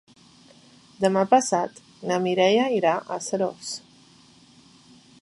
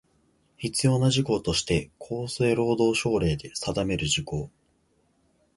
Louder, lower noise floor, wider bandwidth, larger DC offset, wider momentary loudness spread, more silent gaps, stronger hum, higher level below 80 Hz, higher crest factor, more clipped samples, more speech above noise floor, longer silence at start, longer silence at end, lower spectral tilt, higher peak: first, -23 LUFS vs -26 LUFS; second, -54 dBFS vs -67 dBFS; about the same, 11.5 kHz vs 11.5 kHz; neither; first, 14 LU vs 11 LU; neither; neither; second, -70 dBFS vs -46 dBFS; about the same, 20 dB vs 18 dB; neither; second, 31 dB vs 42 dB; first, 1 s vs 0.6 s; first, 1.45 s vs 1.1 s; about the same, -4 dB/octave vs -5 dB/octave; first, -4 dBFS vs -10 dBFS